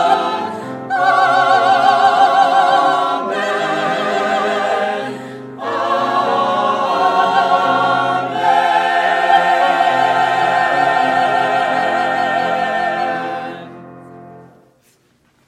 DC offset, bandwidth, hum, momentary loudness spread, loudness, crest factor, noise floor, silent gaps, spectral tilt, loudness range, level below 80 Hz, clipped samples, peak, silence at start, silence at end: under 0.1%; 12.5 kHz; none; 10 LU; -15 LUFS; 16 dB; -57 dBFS; none; -4 dB/octave; 5 LU; -68 dBFS; under 0.1%; 0 dBFS; 0 s; 1.05 s